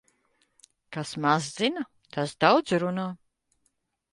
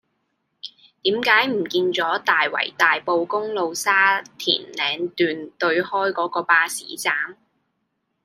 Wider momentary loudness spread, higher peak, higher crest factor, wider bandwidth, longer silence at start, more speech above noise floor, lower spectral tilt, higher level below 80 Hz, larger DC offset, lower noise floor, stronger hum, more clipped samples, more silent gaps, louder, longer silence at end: first, 15 LU vs 8 LU; second, -6 dBFS vs -2 dBFS; about the same, 24 dB vs 20 dB; second, 11.5 kHz vs 15.5 kHz; first, 0.9 s vs 0.65 s; second, 49 dB vs 53 dB; first, -5 dB/octave vs -2.5 dB/octave; about the same, -70 dBFS vs -74 dBFS; neither; about the same, -75 dBFS vs -74 dBFS; neither; neither; neither; second, -26 LUFS vs -20 LUFS; about the same, 1 s vs 0.9 s